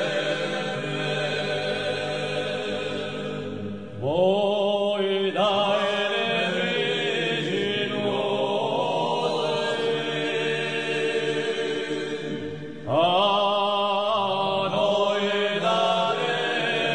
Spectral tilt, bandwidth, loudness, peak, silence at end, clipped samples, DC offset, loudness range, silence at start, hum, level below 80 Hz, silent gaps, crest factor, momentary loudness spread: -4.5 dB/octave; 10 kHz; -24 LUFS; -8 dBFS; 0 s; under 0.1%; 0.3%; 4 LU; 0 s; none; -66 dBFS; none; 16 dB; 7 LU